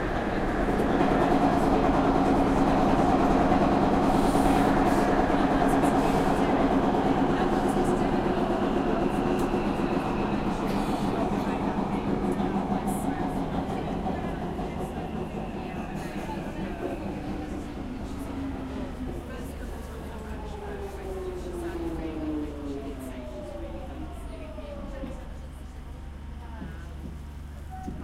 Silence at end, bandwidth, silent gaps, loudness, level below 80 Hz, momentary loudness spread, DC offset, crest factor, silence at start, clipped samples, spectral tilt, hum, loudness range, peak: 0 s; 15.5 kHz; none; -27 LUFS; -38 dBFS; 16 LU; under 0.1%; 16 dB; 0 s; under 0.1%; -7 dB/octave; none; 15 LU; -10 dBFS